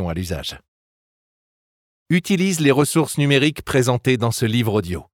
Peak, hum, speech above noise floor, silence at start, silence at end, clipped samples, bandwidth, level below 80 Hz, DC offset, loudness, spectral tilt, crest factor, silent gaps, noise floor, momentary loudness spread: -4 dBFS; none; over 71 dB; 0 s; 0.1 s; under 0.1%; 18 kHz; -48 dBFS; under 0.1%; -19 LUFS; -5 dB/octave; 16 dB; 0.68-2.06 s; under -90 dBFS; 9 LU